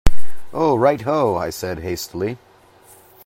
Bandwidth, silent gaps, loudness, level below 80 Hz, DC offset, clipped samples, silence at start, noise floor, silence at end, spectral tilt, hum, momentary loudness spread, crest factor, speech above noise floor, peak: 16 kHz; none; -21 LUFS; -30 dBFS; under 0.1%; 0.3%; 0.05 s; -49 dBFS; 0 s; -6 dB/octave; none; 11 LU; 16 dB; 29 dB; 0 dBFS